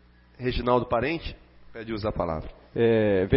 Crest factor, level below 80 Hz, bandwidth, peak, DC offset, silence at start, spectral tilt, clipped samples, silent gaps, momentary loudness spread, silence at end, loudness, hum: 18 dB; -42 dBFS; 5.8 kHz; -8 dBFS; under 0.1%; 0.4 s; -11 dB/octave; under 0.1%; none; 15 LU; 0 s; -26 LUFS; none